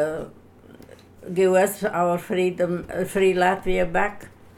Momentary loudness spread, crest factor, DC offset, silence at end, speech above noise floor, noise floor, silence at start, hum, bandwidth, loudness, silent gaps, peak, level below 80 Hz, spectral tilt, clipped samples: 10 LU; 16 dB; under 0.1%; 0.3 s; 25 dB; -47 dBFS; 0 s; none; 16 kHz; -22 LUFS; none; -8 dBFS; -42 dBFS; -5.5 dB/octave; under 0.1%